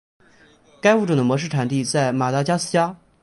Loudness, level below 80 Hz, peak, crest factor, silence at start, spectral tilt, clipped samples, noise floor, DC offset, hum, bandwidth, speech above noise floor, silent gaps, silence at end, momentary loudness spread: -20 LUFS; -62 dBFS; -4 dBFS; 18 dB; 0.85 s; -5.5 dB/octave; under 0.1%; -53 dBFS; under 0.1%; none; 11.5 kHz; 34 dB; none; 0.3 s; 4 LU